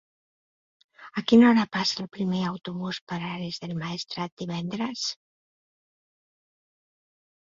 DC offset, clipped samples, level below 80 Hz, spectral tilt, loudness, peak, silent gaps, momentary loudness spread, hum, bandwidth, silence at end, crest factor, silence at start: under 0.1%; under 0.1%; -66 dBFS; -5.5 dB/octave; -26 LUFS; -6 dBFS; 3.01-3.07 s, 4.32-4.37 s; 15 LU; none; 7.6 kHz; 2.25 s; 22 dB; 1 s